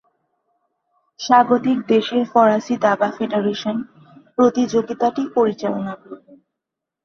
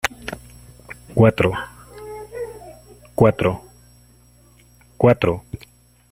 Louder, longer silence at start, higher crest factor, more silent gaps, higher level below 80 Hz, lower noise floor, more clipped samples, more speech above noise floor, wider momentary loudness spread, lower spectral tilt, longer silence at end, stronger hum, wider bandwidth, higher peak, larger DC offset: about the same, -18 LUFS vs -19 LUFS; first, 1.2 s vs 0.05 s; about the same, 18 dB vs 20 dB; neither; second, -64 dBFS vs -46 dBFS; first, -83 dBFS vs -52 dBFS; neither; first, 65 dB vs 35 dB; second, 13 LU vs 23 LU; second, -5.5 dB/octave vs -7 dB/octave; first, 0.9 s vs 0.55 s; second, none vs 60 Hz at -45 dBFS; second, 7 kHz vs 15.5 kHz; about the same, -2 dBFS vs -2 dBFS; neither